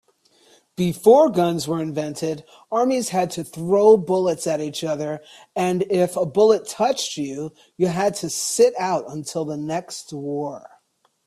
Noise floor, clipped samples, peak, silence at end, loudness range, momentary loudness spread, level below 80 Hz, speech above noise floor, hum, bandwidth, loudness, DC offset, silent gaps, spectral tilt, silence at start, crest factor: -64 dBFS; under 0.1%; -2 dBFS; 0.7 s; 4 LU; 15 LU; -64 dBFS; 44 dB; none; 14.5 kHz; -21 LUFS; under 0.1%; none; -5 dB/octave; 0.8 s; 18 dB